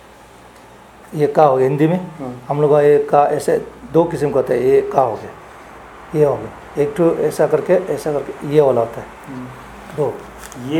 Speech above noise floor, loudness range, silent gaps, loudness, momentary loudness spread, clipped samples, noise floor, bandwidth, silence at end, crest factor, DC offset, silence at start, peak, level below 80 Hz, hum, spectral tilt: 26 dB; 3 LU; none; -16 LUFS; 19 LU; under 0.1%; -42 dBFS; 14.5 kHz; 0 s; 18 dB; under 0.1%; 1.1 s; 0 dBFS; -50 dBFS; none; -7 dB/octave